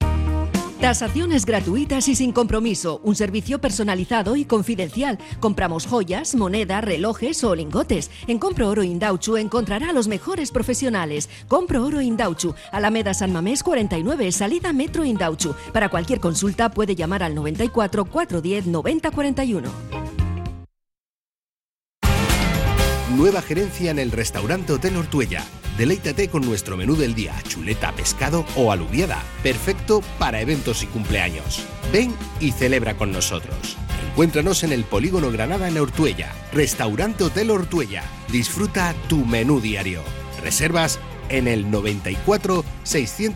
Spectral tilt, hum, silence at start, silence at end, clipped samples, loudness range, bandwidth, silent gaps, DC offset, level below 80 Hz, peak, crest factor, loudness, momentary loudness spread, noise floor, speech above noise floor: -5 dB/octave; none; 0 s; 0 s; under 0.1%; 2 LU; 16.5 kHz; 21.00-21.27 s, 21.36-21.77 s, 21.86-22.01 s; under 0.1%; -32 dBFS; -6 dBFS; 16 dB; -21 LUFS; 6 LU; under -90 dBFS; over 69 dB